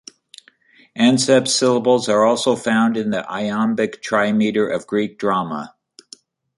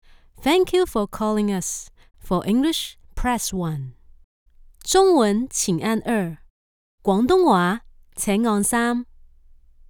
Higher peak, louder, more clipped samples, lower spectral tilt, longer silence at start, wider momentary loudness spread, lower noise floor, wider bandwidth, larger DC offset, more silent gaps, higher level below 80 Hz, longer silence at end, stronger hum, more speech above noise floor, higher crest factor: first, -2 dBFS vs -6 dBFS; first, -18 LUFS vs -21 LUFS; neither; about the same, -4 dB/octave vs -4.5 dB/octave; first, 0.95 s vs 0.4 s; second, 8 LU vs 14 LU; about the same, -53 dBFS vs -50 dBFS; second, 11.5 kHz vs 19.5 kHz; neither; second, none vs 4.24-4.46 s, 6.50-6.98 s; second, -62 dBFS vs -42 dBFS; about the same, 0.9 s vs 0.85 s; neither; first, 35 dB vs 30 dB; about the same, 16 dB vs 16 dB